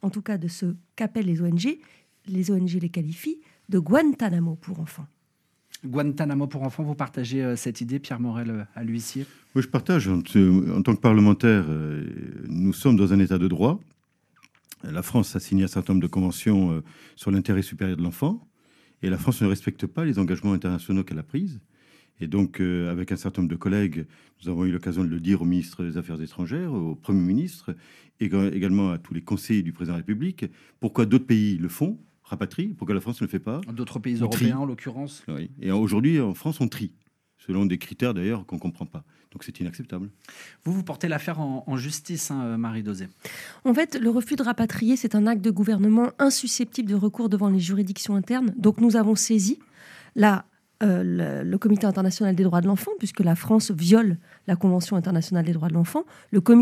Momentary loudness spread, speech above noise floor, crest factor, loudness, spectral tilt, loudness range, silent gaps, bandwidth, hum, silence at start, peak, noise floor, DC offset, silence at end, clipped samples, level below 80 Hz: 14 LU; 46 dB; 20 dB; -24 LUFS; -6.5 dB/octave; 7 LU; none; 15.5 kHz; none; 0.05 s; -4 dBFS; -70 dBFS; under 0.1%; 0 s; under 0.1%; -58 dBFS